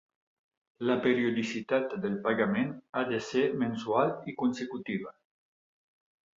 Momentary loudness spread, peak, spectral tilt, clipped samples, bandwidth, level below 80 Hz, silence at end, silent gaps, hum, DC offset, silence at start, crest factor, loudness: 8 LU; -12 dBFS; -6 dB/octave; under 0.1%; 7.6 kHz; -72 dBFS; 1.25 s; 2.89-2.93 s; none; under 0.1%; 0.8 s; 20 dB; -30 LUFS